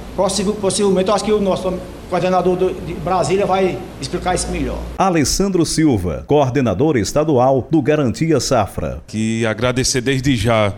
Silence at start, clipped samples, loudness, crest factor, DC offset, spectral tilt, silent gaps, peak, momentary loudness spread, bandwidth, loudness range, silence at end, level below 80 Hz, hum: 0 s; under 0.1%; -17 LUFS; 12 dB; under 0.1%; -5 dB/octave; none; -4 dBFS; 8 LU; 16.5 kHz; 3 LU; 0 s; -34 dBFS; none